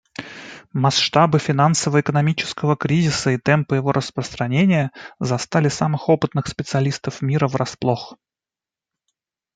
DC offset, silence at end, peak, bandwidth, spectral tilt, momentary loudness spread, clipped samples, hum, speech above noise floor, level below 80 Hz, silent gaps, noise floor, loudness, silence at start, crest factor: under 0.1%; 1.4 s; -2 dBFS; 9.4 kHz; -5.5 dB/octave; 11 LU; under 0.1%; none; 71 dB; -54 dBFS; none; -90 dBFS; -19 LUFS; 0.2 s; 18 dB